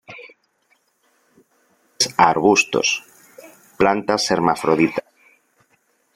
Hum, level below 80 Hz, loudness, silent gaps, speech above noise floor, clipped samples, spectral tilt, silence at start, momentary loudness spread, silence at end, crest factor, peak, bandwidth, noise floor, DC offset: none; -58 dBFS; -18 LUFS; none; 47 dB; under 0.1%; -3.5 dB/octave; 0.1 s; 11 LU; 1.15 s; 20 dB; 0 dBFS; 16 kHz; -64 dBFS; under 0.1%